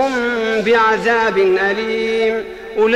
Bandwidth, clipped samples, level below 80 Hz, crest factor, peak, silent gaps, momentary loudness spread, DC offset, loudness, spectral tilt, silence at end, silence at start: 11 kHz; under 0.1%; -48 dBFS; 10 dB; -6 dBFS; none; 6 LU; under 0.1%; -16 LUFS; -4.5 dB/octave; 0 s; 0 s